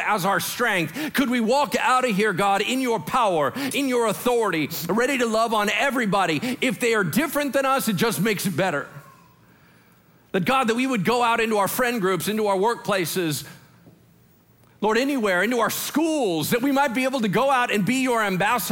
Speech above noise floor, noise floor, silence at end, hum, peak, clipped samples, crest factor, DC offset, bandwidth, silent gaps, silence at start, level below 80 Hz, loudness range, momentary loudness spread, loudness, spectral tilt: 34 dB; -56 dBFS; 0 s; none; -8 dBFS; under 0.1%; 14 dB; under 0.1%; 17 kHz; none; 0 s; -60 dBFS; 3 LU; 4 LU; -22 LUFS; -4 dB/octave